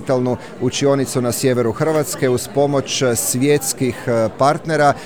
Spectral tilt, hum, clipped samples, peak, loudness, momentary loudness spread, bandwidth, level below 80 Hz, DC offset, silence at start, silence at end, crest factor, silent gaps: -4.5 dB/octave; none; under 0.1%; -2 dBFS; -17 LUFS; 4 LU; over 20 kHz; -52 dBFS; 0.7%; 0 s; 0 s; 16 dB; none